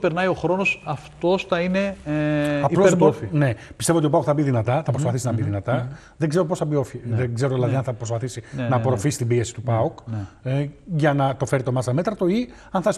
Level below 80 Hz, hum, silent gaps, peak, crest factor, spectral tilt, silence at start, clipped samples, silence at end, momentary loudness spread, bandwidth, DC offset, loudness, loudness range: -52 dBFS; none; none; -4 dBFS; 18 dB; -6.5 dB/octave; 0 s; under 0.1%; 0 s; 8 LU; 13 kHz; under 0.1%; -22 LUFS; 4 LU